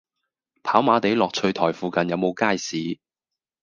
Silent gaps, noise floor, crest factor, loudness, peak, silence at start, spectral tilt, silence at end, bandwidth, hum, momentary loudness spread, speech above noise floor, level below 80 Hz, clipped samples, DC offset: none; -88 dBFS; 22 dB; -22 LUFS; -2 dBFS; 0.65 s; -5 dB/octave; 0.7 s; 9.8 kHz; none; 11 LU; 66 dB; -64 dBFS; under 0.1%; under 0.1%